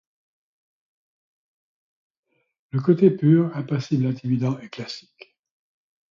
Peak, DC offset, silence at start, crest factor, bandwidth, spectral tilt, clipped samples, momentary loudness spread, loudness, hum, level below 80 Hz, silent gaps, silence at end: -4 dBFS; under 0.1%; 2.75 s; 20 dB; 7.4 kHz; -8.5 dB/octave; under 0.1%; 16 LU; -21 LUFS; none; -68 dBFS; none; 1.1 s